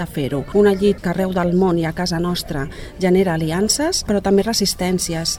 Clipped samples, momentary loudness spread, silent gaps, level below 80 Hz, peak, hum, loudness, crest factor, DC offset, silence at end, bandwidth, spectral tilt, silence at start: under 0.1%; 7 LU; none; -36 dBFS; -2 dBFS; none; -18 LUFS; 16 dB; under 0.1%; 0 s; 17 kHz; -4.5 dB/octave; 0 s